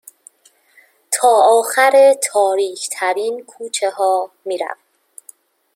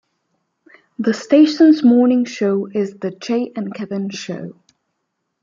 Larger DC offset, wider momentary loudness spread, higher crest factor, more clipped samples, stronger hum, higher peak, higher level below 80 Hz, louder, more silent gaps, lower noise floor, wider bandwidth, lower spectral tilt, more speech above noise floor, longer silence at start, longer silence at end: neither; about the same, 14 LU vs 16 LU; about the same, 16 dB vs 16 dB; neither; neither; about the same, -2 dBFS vs -2 dBFS; second, -76 dBFS vs -68 dBFS; about the same, -15 LUFS vs -16 LUFS; neither; second, -54 dBFS vs -74 dBFS; first, 16.5 kHz vs 7.6 kHz; second, 0 dB/octave vs -6 dB/octave; second, 39 dB vs 58 dB; about the same, 1.1 s vs 1 s; about the same, 1 s vs 0.9 s